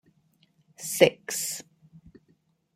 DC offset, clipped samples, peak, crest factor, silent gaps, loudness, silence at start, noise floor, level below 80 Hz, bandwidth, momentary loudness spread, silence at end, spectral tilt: under 0.1%; under 0.1%; -4 dBFS; 26 dB; none; -26 LUFS; 0.8 s; -68 dBFS; -70 dBFS; 16 kHz; 16 LU; 1.15 s; -3 dB/octave